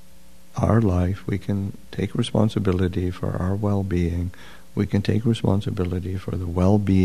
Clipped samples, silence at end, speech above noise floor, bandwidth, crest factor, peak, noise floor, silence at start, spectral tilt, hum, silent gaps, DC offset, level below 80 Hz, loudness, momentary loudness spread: under 0.1%; 0 s; 30 dB; 13 kHz; 20 dB; -2 dBFS; -52 dBFS; 0.55 s; -8 dB/octave; none; none; 1%; -42 dBFS; -23 LUFS; 9 LU